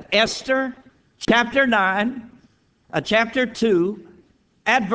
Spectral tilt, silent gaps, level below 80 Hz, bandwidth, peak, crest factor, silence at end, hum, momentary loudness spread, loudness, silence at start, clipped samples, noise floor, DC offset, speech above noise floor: -4 dB/octave; none; -54 dBFS; 8 kHz; -2 dBFS; 18 dB; 0 s; none; 11 LU; -20 LUFS; 0 s; under 0.1%; -58 dBFS; under 0.1%; 39 dB